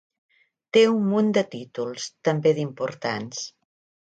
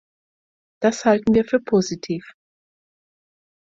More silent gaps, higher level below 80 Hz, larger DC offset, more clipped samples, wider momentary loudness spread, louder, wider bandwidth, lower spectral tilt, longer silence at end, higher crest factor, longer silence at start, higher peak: neither; second, -72 dBFS vs -56 dBFS; neither; neither; about the same, 13 LU vs 11 LU; second, -24 LUFS vs -20 LUFS; first, 9 kHz vs 7.8 kHz; about the same, -5.5 dB/octave vs -5.5 dB/octave; second, 0.65 s vs 1.4 s; about the same, 18 dB vs 20 dB; about the same, 0.75 s vs 0.8 s; about the same, -6 dBFS vs -4 dBFS